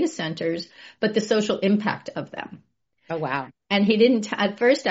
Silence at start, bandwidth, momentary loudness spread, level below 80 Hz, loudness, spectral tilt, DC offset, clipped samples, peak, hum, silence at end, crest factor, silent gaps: 0 s; 8 kHz; 14 LU; -68 dBFS; -23 LUFS; -4 dB/octave; under 0.1%; under 0.1%; -6 dBFS; none; 0 s; 18 dB; none